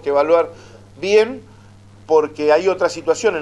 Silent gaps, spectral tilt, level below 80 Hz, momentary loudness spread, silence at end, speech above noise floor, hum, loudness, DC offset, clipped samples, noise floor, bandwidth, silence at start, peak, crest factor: none; -4 dB/octave; -54 dBFS; 9 LU; 0 s; 27 dB; none; -17 LUFS; under 0.1%; under 0.1%; -44 dBFS; 11.5 kHz; 0.05 s; -2 dBFS; 16 dB